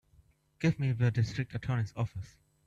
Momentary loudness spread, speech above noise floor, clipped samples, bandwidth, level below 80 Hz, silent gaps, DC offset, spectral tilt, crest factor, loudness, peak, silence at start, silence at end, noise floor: 9 LU; 34 dB; under 0.1%; 7.8 kHz; -58 dBFS; none; under 0.1%; -7.5 dB/octave; 16 dB; -32 LUFS; -16 dBFS; 0.6 s; 0.4 s; -65 dBFS